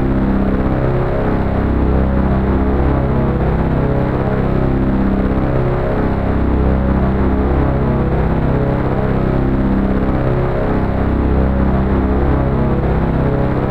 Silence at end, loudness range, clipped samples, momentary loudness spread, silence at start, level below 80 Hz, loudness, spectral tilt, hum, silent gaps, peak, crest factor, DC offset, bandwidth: 0 s; 0 LU; under 0.1%; 2 LU; 0 s; -18 dBFS; -16 LUFS; -10.5 dB/octave; 50 Hz at -45 dBFS; none; -2 dBFS; 12 dB; 0.4%; 4.7 kHz